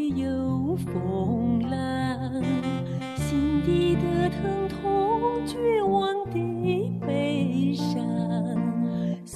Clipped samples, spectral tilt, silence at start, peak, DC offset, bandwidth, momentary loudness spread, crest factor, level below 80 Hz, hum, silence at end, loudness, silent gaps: under 0.1%; -7.5 dB/octave; 0 s; -12 dBFS; under 0.1%; 13.5 kHz; 5 LU; 14 dB; -48 dBFS; none; 0 s; -26 LUFS; none